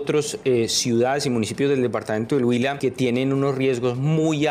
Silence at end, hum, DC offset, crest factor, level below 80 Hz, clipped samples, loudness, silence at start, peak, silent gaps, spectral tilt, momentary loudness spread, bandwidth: 0 s; none; under 0.1%; 10 dB; -58 dBFS; under 0.1%; -21 LUFS; 0 s; -10 dBFS; none; -5 dB/octave; 4 LU; 15.5 kHz